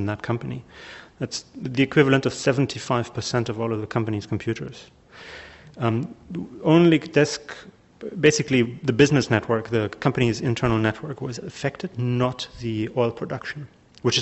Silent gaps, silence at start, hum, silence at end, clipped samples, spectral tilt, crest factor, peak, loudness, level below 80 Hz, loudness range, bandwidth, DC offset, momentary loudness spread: none; 0 s; none; 0 s; under 0.1%; -5.5 dB/octave; 20 dB; -2 dBFS; -23 LUFS; -52 dBFS; 7 LU; 8.2 kHz; under 0.1%; 19 LU